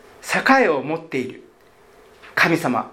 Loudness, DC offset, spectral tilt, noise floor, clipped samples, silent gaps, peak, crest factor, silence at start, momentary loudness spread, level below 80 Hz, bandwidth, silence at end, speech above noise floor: -19 LUFS; under 0.1%; -4.5 dB/octave; -51 dBFS; under 0.1%; none; 0 dBFS; 20 dB; 0.25 s; 12 LU; -64 dBFS; 16.5 kHz; 0 s; 32 dB